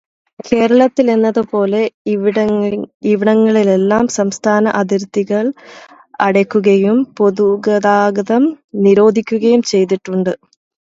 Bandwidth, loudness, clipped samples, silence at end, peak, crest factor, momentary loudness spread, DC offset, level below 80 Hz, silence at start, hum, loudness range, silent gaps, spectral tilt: 8 kHz; -13 LUFS; under 0.1%; 0.6 s; 0 dBFS; 14 dB; 7 LU; under 0.1%; -56 dBFS; 0.45 s; none; 2 LU; 1.94-2.05 s, 2.94-3.00 s, 8.64-8.68 s; -6 dB/octave